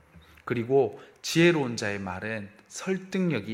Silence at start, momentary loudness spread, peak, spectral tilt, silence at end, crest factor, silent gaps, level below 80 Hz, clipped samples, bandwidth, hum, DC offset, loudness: 0.15 s; 15 LU; -8 dBFS; -5.5 dB/octave; 0 s; 20 dB; none; -64 dBFS; under 0.1%; 16 kHz; none; under 0.1%; -27 LUFS